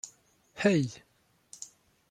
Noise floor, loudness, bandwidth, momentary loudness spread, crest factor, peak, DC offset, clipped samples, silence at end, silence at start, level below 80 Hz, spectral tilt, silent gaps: -62 dBFS; -29 LUFS; 13 kHz; 25 LU; 22 dB; -10 dBFS; under 0.1%; under 0.1%; 0.45 s; 0.05 s; -72 dBFS; -5.5 dB/octave; none